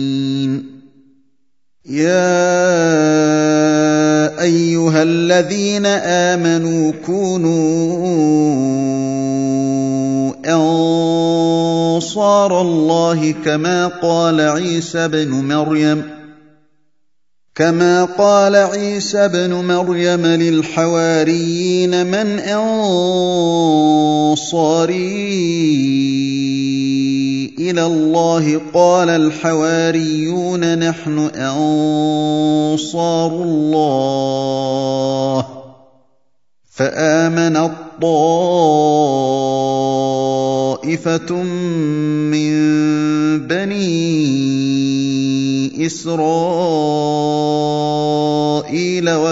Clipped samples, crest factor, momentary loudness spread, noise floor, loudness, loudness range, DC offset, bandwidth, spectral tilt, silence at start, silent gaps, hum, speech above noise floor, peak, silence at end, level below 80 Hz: under 0.1%; 14 dB; 5 LU; -75 dBFS; -15 LUFS; 3 LU; 0.2%; 8 kHz; -5.5 dB/octave; 0 s; none; none; 61 dB; 0 dBFS; 0 s; -62 dBFS